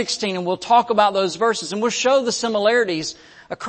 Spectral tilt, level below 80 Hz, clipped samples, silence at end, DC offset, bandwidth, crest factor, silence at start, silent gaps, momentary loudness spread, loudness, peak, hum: -3 dB/octave; -62 dBFS; under 0.1%; 0 s; under 0.1%; 8.8 kHz; 16 dB; 0 s; none; 7 LU; -19 LUFS; -4 dBFS; none